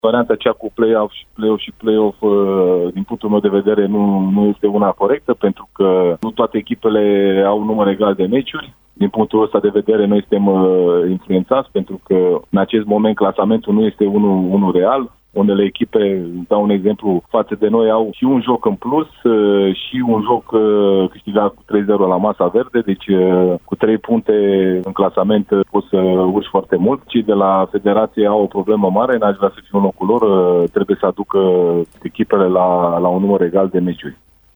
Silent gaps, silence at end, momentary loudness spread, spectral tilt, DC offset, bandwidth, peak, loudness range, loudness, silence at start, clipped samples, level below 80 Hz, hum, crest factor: none; 0.4 s; 5 LU; -9.5 dB/octave; under 0.1%; over 20 kHz; 0 dBFS; 1 LU; -15 LUFS; 0.05 s; under 0.1%; -52 dBFS; none; 14 dB